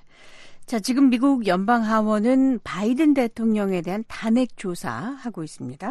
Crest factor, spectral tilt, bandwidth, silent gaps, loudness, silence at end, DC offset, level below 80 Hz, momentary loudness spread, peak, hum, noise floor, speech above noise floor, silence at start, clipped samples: 14 dB; -6 dB/octave; 13 kHz; none; -22 LUFS; 0 s; under 0.1%; -54 dBFS; 12 LU; -8 dBFS; none; -44 dBFS; 23 dB; 0.25 s; under 0.1%